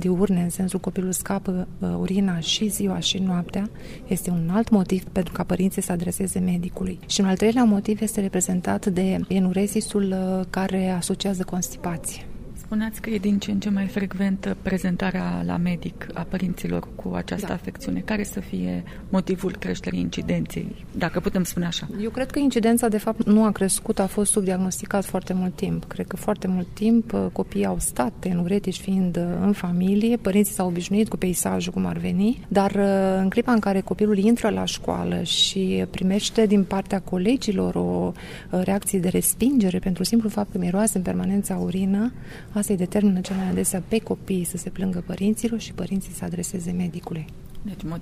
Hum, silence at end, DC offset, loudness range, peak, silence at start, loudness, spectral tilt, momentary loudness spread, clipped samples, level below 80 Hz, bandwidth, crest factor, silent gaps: none; 0 s; under 0.1%; 5 LU; -6 dBFS; 0 s; -24 LUFS; -5 dB/octave; 9 LU; under 0.1%; -42 dBFS; 15.5 kHz; 18 dB; none